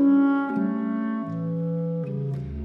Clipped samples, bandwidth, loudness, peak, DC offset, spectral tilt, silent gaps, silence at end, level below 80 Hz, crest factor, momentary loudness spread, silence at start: under 0.1%; 3.5 kHz; -26 LUFS; -12 dBFS; under 0.1%; -11 dB/octave; none; 0 s; -48 dBFS; 12 dB; 9 LU; 0 s